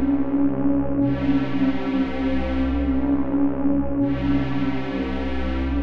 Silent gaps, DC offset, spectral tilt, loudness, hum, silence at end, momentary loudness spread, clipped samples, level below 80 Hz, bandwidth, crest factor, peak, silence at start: none; 4%; -9 dB/octave; -23 LUFS; none; 0 s; 5 LU; under 0.1%; -32 dBFS; 5.6 kHz; 10 dB; -10 dBFS; 0 s